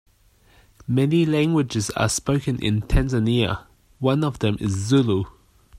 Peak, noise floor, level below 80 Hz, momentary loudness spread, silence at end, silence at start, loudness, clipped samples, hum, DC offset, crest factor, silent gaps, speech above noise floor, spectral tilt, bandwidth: -6 dBFS; -57 dBFS; -34 dBFS; 7 LU; 0.5 s; 0.9 s; -22 LUFS; under 0.1%; none; under 0.1%; 16 dB; none; 36 dB; -6 dB/octave; 14.5 kHz